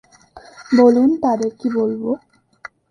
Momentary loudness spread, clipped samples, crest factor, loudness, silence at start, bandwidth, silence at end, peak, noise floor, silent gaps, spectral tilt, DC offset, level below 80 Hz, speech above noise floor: 12 LU; under 0.1%; 18 dB; -17 LUFS; 0.35 s; 9.6 kHz; 0.25 s; -2 dBFS; -44 dBFS; none; -6.5 dB/octave; under 0.1%; -60 dBFS; 29 dB